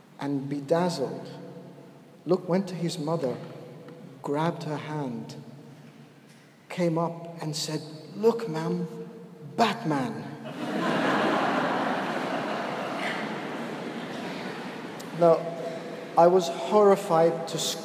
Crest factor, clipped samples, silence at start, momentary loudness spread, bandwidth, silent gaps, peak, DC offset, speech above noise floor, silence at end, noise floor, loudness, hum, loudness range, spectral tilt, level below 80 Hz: 20 dB; under 0.1%; 0.2 s; 20 LU; 15.5 kHz; none; -8 dBFS; under 0.1%; 27 dB; 0 s; -53 dBFS; -27 LUFS; none; 9 LU; -5.5 dB/octave; -80 dBFS